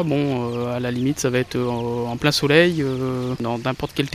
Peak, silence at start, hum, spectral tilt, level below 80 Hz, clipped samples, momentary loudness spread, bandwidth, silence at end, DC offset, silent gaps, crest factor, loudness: -2 dBFS; 0 s; none; -5.5 dB/octave; -48 dBFS; under 0.1%; 9 LU; 15 kHz; 0 s; under 0.1%; none; 18 dB; -21 LUFS